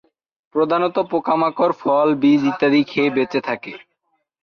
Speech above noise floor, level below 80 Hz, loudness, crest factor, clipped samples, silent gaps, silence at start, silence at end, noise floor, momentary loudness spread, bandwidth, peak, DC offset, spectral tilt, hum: 53 dB; -64 dBFS; -18 LUFS; 14 dB; under 0.1%; none; 0.55 s; 0.65 s; -71 dBFS; 9 LU; 6.6 kHz; -6 dBFS; under 0.1%; -7 dB/octave; none